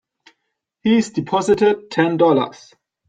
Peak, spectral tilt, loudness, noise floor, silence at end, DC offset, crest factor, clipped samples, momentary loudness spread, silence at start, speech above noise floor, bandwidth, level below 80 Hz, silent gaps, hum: -2 dBFS; -6 dB/octave; -18 LUFS; -76 dBFS; 0.55 s; under 0.1%; 16 dB; under 0.1%; 6 LU; 0.85 s; 59 dB; 9.2 kHz; -58 dBFS; none; none